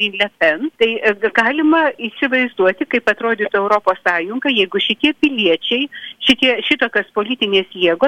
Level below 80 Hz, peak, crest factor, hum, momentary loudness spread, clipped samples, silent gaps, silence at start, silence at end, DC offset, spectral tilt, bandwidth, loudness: -56 dBFS; -2 dBFS; 14 dB; none; 5 LU; under 0.1%; none; 0 s; 0 s; under 0.1%; -4.5 dB/octave; 11.5 kHz; -16 LUFS